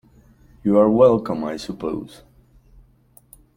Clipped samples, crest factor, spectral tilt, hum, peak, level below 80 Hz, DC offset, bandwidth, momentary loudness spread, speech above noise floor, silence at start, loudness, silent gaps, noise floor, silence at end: under 0.1%; 20 dB; -8 dB/octave; none; -2 dBFS; -50 dBFS; under 0.1%; 16 kHz; 15 LU; 36 dB; 0.65 s; -19 LUFS; none; -54 dBFS; 1.5 s